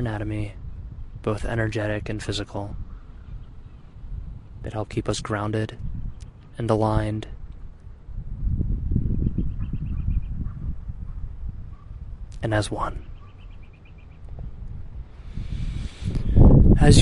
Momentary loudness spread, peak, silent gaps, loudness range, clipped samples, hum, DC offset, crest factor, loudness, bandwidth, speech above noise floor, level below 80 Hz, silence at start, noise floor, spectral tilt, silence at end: 21 LU; -2 dBFS; none; 6 LU; under 0.1%; none; under 0.1%; 22 dB; -25 LUFS; 11.5 kHz; 18 dB; -28 dBFS; 0 s; -44 dBFS; -6.5 dB/octave; 0 s